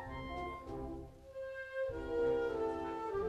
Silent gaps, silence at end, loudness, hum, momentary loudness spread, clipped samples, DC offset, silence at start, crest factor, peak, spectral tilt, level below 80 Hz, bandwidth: none; 0 s; -40 LUFS; none; 12 LU; under 0.1%; under 0.1%; 0 s; 14 dB; -26 dBFS; -7 dB/octave; -54 dBFS; 11.5 kHz